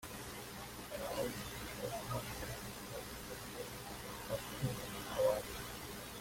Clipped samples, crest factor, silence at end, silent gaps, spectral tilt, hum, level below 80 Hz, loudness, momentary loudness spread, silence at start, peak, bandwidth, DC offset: under 0.1%; 20 dB; 0 s; none; -4 dB/octave; 60 Hz at -55 dBFS; -58 dBFS; -43 LUFS; 11 LU; 0 s; -22 dBFS; 16.5 kHz; under 0.1%